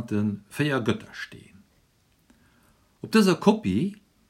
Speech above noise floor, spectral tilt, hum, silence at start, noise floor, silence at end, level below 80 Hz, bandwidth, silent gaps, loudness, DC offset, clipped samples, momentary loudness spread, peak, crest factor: 40 dB; -6 dB/octave; none; 0 s; -65 dBFS; 0.35 s; -64 dBFS; 15.5 kHz; none; -24 LUFS; under 0.1%; under 0.1%; 18 LU; -4 dBFS; 22 dB